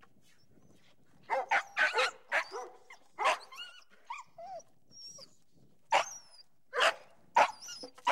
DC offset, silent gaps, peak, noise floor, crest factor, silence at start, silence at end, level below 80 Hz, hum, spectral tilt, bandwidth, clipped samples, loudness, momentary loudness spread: 0.1%; none; -12 dBFS; -68 dBFS; 24 dB; 1.3 s; 0 s; -84 dBFS; none; 0 dB/octave; 16 kHz; under 0.1%; -32 LUFS; 20 LU